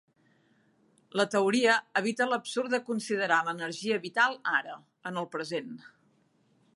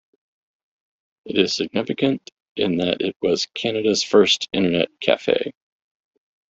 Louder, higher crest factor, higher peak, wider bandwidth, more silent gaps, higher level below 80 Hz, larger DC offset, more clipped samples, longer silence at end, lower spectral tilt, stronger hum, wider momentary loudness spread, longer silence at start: second, -29 LUFS vs -20 LUFS; about the same, 20 dB vs 20 dB; second, -10 dBFS vs -2 dBFS; first, 11.5 kHz vs 8 kHz; second, none vs 2.32-2.55 s, 3.16-3.20 s; second, -84 dBFS vs -62 dBFS; neither; neither; about the same, 1 s vs 1 s; about the same, -3.5 dB/octave vs -4 dB/octave; neither; first, 12 LU vs 8 LU; about the same, 1.15 s vs 1.25 s